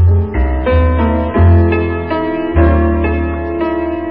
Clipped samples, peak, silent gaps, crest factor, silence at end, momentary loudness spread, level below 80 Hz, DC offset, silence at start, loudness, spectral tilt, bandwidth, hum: under 0.1%; 0 dBFS; none; 12 dB; 0 s; 7 LU; -16 dBFS; 1%; 0 s; -13 LUFS; -14 dB/octave; 4.4 kHz; none